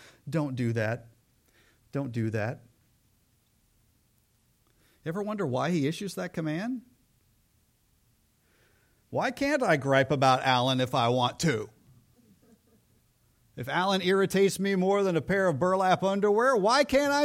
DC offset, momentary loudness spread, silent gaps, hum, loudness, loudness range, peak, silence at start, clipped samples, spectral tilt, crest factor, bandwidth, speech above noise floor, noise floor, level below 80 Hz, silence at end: under 0.1%; 12 LU; none; none; -27 LUFS; 13 LU; -10 dBFS; 0.25 s; under 0.1%; -5.5 dB/octave; 20 dB; 16.5 kHz; 42 dB; -68 dBFS; -62 dBFS; 0 s